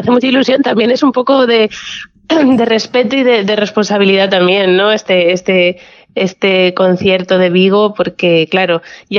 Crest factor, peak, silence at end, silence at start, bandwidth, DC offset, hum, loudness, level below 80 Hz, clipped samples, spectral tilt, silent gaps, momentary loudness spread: 10 dB; 0 dBFS; 0 s; 0 s; 7.2 kHz; under 0.1%; none; -11 LUFS; -54 dBFS; under 0.1%; -5.5 dB/octave; none; 6 LU